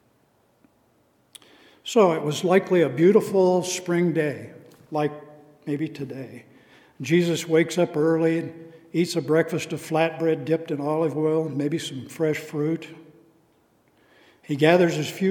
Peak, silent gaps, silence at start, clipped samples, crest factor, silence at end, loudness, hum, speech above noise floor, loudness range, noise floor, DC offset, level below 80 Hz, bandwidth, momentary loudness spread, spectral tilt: -2 dBFS; none; 1.85 s; under 0.1%; 22 dB; 0 s; -23 LUFS; none; 41 dB; 7 LU; -63 dBFS; under 0.1%; -76 dBFS; 18 kHz; 15 LU; -6 dB/octave